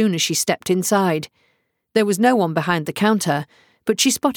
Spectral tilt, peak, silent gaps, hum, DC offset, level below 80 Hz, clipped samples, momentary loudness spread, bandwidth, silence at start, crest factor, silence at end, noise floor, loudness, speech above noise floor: -4 dB/octave; -4 dBFS; none; none; under 0.1%; -64 dBFS; under 0.1%; 9 LU; over 20 kHz; 0 s; 16 dB; 0.05 s; -67 dBFS; -19 LUFS; 48 dB